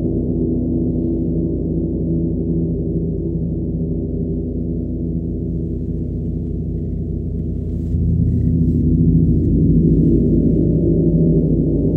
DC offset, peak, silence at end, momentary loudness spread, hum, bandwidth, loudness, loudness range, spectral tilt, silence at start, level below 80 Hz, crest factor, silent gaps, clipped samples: under 0.1%; -2 dBFS; 0 s; 9 LU; none; 0.9 kHz; -18 LUFS; 8 LU; -14.5 dB/octave; 0 s; -26 dBFS; 14 dB; none; under 0.1%